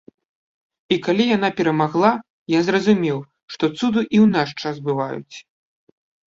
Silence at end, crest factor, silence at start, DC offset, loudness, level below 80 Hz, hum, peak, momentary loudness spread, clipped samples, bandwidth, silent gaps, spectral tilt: 0.9 s; 18 dB; 0.9 s; under 0.1%; -19 LUFS; -60 dBFS; none; -2 dBFS; 12 LU; under 0.1%; 7.6 kHz; 2.30-2.46 s, 3.43-3.48 s; -6.5 dB/octave